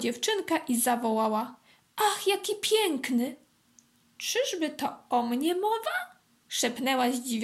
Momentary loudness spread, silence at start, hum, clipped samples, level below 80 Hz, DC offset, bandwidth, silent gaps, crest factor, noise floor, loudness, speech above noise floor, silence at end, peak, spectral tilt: 9 LU; 0 s; none; under 0.1%; -80 dBFS; under 0.1%; 16 kHz; none; 16 dB; -63 dBFS; -28 LUFS; 35 dB; 0 s; -12 dBFS; -2 dB/octave